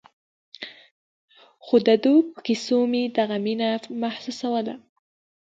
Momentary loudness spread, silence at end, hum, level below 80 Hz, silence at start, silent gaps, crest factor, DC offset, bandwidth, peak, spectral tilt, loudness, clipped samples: 20 LU; 0.65 s; none; -74 dBFS; 0.6 s; 0.91-1.28 s; 18 dB; under 0.1%; 7.8 kHz; -6 dBFS; -5.5 dB/octave; -23 LUFS; under 0.1%